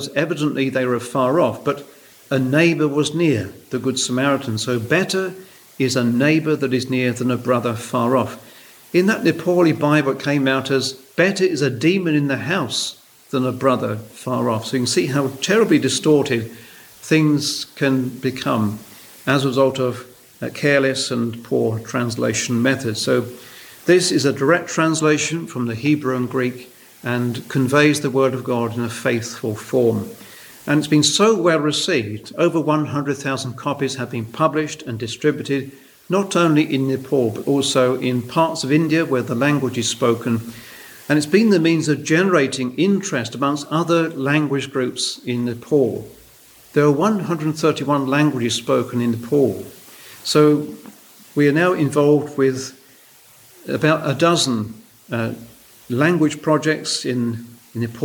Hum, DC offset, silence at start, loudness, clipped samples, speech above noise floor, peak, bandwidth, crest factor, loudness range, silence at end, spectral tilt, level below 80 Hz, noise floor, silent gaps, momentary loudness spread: none; under 0.1%; 0 s; -19 LUFS; under 0.1%; 30 dB; -2 dBFS; over 20 kHz; 18 dB; 3 LU; 0 s; -5 dB/octave; -62 dBFS; -48 dBFS; none; 11 LU